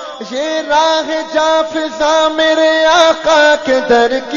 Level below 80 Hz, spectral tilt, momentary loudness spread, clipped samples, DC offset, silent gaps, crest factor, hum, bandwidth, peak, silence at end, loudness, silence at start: -46 dBFS; -2 dB/octave; 8 LU; under 0.1%; under 0.1%; none; 12 dB; none; 7.4 kHz; 0 dBFS; 0 s; -11 LUFS; 0 s